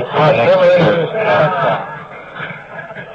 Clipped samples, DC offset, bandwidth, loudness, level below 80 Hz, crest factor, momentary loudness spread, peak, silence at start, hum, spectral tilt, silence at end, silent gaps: under 0.1%; under 0.1%; 7 kHz; -12 LUFS; -52 dBFS; 12 dB; 19 LU; -2 dBFS; 0 s; none; -7.5 dB/octave; 0 s; none